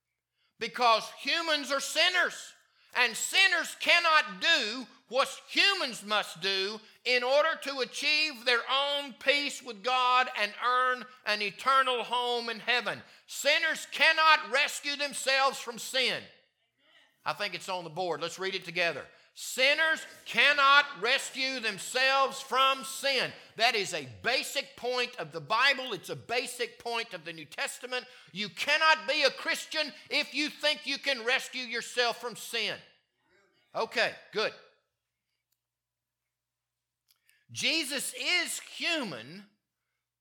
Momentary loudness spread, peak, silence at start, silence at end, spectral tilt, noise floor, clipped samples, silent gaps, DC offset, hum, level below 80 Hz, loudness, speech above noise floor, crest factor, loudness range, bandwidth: 13 LU; -6 dBFS; 0.6 s; 0.75 s; -1 dB/octave; -89 dBFS; under 0.1%; none; under 0.1%; none; -86 dBFS; -28 LUFS; 60 dB; 24 dB; 9 LU; 19 kHz